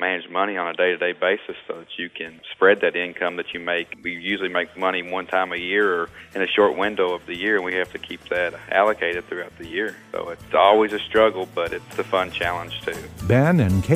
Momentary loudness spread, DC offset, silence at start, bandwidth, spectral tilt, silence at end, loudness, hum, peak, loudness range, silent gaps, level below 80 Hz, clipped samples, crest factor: 13 LU; under 0.1%; 0 s; 15.5 kHz; -6 dB/octave; 0 s; -22 LUFS; none; -2 dBFS; 3 LU; none; -50 dBFS; under 0.1%; 20 dB